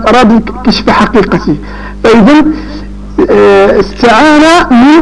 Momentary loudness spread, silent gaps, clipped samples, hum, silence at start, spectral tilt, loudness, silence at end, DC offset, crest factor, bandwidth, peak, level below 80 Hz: 13 LU; none; 0.9%; 50 Hz at -25 dBFS; 0 s; -5.5 dB/octave; -6 LUFS; 0 s; under 0.1%; 6 dB; 11.5 kHz; 0 dBFS; -24 dBFS